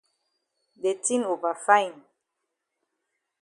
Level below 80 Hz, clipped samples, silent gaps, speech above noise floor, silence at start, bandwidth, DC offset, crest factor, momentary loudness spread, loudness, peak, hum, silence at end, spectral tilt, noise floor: -82 dBFS; under 0.1%; none; 58 dB; 0.85 s; 11.5 kHz; under 0.1%; 24 dB; 9 LU; -25 LUFS; -4 dBFS; none; 1.5 s; -2 dB/octave; -82 dBFS